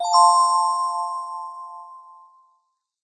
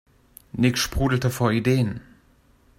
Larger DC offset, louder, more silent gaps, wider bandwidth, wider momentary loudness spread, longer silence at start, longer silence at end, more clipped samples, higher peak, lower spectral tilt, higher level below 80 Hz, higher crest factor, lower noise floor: neither; first, -19 LUFS vs -22 LUFS; neither; second, 9.4 kHz vs 16.5 kHz; first, 23 LU vs 10 LU; second, 0 s vs 0.55 s; first, 1.05 s vs 0.8 s; neither; first, -4 dBFS vs -8 dBFS; second, 4.5 dB/octave vs -5.5 dB/octave; second, under -90 dBFS vs -40 dBFS; about the same, 18 dB vs 18 dB; first, -70 dBFS vs -58 dBFS